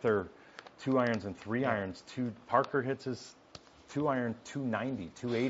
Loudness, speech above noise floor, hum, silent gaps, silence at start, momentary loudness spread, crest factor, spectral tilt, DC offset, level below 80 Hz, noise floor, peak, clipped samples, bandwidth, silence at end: -34 LUFS; 22 dB; none; none; 0 s; 20 LU; 22 dB; -5.5 dB/octave; under 0.1%; -72 dBFS; -56 dBFS; -12 dBFS; under 0.1%; 7.6 kHz; 0 s